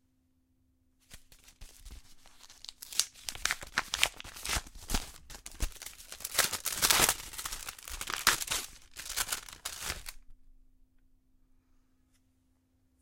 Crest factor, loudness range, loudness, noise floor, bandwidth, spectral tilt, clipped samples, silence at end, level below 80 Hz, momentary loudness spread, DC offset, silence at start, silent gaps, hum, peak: 34 dB; 11 LU; -32 LUFS; -72 dBFS; 17 kHz; 0 dB/octave; under 0.1%; 2.45 s; -48 dBFS; 19 LU; under 0.1%; 1.1 s; none; none; -4 dBFS